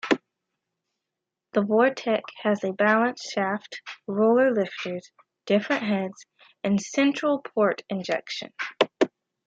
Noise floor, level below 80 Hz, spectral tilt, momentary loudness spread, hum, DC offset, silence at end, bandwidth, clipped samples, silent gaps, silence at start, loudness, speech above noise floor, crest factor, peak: -86 dBFS; -74 dBFS; -5 dB/octave; 12 LU; none; under 0.1%; 0.4 s; 7.8 kHz; under 0.1%; none; 0.05 s; -25 LUFS; 61 dB; 20 dB; -6 dBFS